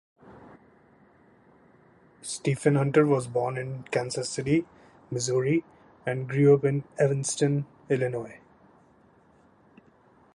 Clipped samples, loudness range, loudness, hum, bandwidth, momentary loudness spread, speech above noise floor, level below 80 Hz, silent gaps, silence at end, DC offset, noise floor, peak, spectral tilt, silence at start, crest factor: under 0.1%; 4 LU; -26 LUFS; none; 11.5 kHz; 14 LU; 34 dB; -64 dBFS; none; 2 s; under 0.1%; -60 dBFS; -8 dBFS; -6 dB/octave; 0.25 s; 20 dB